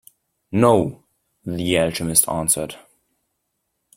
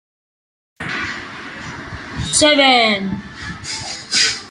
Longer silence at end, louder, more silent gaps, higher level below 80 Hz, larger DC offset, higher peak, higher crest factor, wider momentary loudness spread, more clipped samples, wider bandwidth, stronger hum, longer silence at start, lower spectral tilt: first, 1.2 s vs 0 s; second, -19 LUFS vs -15 LUFS; neither; second, -52 dBFS vs -46 dBFS; neither; about the same, 0 dBFS vs 0 dBFS; about the same, 22 dB vs 18 dB; second, 14 LU vs 19 LU; neither; first, 16.5 kHz vs 11.5 kHz; neither; second, 0.5 s vs 0.8 s; first, -4 dB/octave vs -2 dB/octave